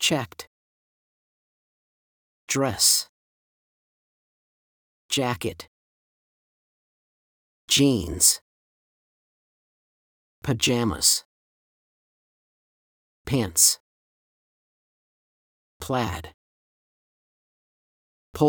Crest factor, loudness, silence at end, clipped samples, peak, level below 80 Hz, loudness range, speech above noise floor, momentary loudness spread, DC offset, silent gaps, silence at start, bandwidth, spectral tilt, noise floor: 26 dB; -22 LUFS; 0 s; under 0.1%; -4 dBFS; -56 dBFS; 11 LU; over 67 dB; 18 LU; under 0.1%; 0.47-2.47 s, 3.09-5.09 s, 5.68-7.68 s, 8.41-10.42 s, 11.25-13.25 s, 13.80-15.80 s, 16.34-18.33 s; 0 s; over 20 kHz; -2.5 dB/octave; under -90 dBFS